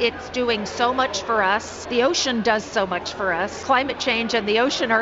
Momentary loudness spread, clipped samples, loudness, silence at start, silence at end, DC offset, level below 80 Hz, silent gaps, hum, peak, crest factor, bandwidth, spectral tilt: 5 LU; under 0.1%; -21 LUFS; 0 s; 0 s; under 0.1%; -52 dBFS; none; none; -4 dBFS; 16 dB; 8 kHz; -3 dB/octave